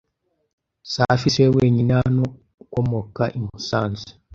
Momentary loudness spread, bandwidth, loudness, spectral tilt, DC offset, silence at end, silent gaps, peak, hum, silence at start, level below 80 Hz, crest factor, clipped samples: 12 LU; 7.4 kHz; -21 LUFS; -6.5 dB/octave; under 0.1%; 0.25 s; 2.54-2.58 s; -2 dBFS; none; 0.85 s; -46 dBFS; 20 dB; under 0.1%